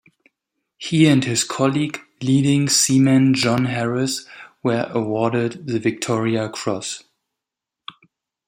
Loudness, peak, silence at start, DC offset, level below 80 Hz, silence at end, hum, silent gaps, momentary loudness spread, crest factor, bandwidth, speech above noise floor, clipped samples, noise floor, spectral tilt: -19 LUFS; -2 dBFS; 0.8 s; under 0.1%; -60 dBFS; 1.5 s; none; none; 14 LU; 18 dB; 16 kHz; 66 dB; under 0.1%; -85 dBFS; -4.5 dB/octave